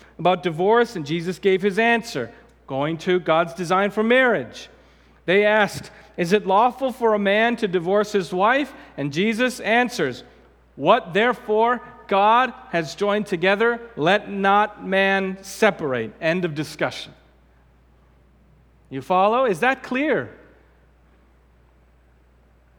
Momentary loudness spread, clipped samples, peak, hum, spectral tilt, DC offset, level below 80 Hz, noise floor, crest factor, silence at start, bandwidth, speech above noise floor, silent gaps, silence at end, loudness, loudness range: 10 LU; under 0.1%; 0 dBFS; none; -5 dB/octave; under 0.1%; -56 dBFS; -55 dBFS; 20 dB; 0.2 s; 18.5 kHz; 35 dB; none; 2.45 s; -20 LUFS; 5 LU